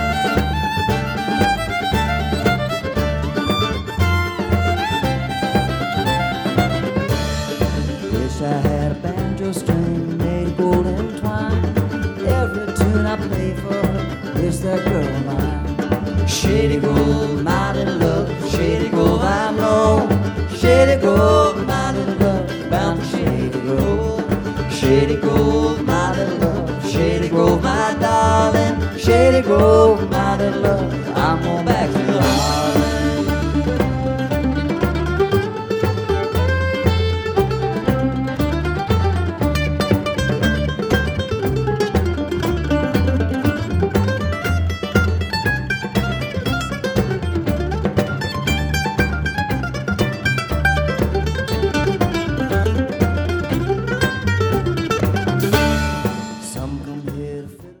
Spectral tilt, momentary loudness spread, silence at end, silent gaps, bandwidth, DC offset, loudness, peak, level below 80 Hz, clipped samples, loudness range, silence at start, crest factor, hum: -6 dB/octave; 6 LU; 0.05 s; none; over 20 kHz; under 0.1%; -18 LUFS; 0 dBFS; -28 dBFS; under 0.1%; 5 LU; 0 s; 18 dB; none